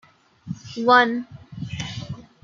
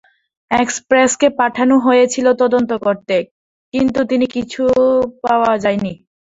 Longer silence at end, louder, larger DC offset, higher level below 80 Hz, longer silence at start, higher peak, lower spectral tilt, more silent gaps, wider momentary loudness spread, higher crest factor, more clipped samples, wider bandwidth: about the same, 0.2 s vs 0.25 s; second, -20 LUFS vs -15 LUFS; neither; second, -56 dBFS vs -50 dBFS; about the same, 0.45 s vs 0.5 s; about the same, -2 dBFS vs 0 dBFS; about the same, -5 dB/octave vs -4 dB/octave; second, none vs 3.31-3.72 s; first, 21 LU vs 7 LU; first, 22 dB vs 14 dB; neither; about the same, 7.6 kHz vs 8 kHz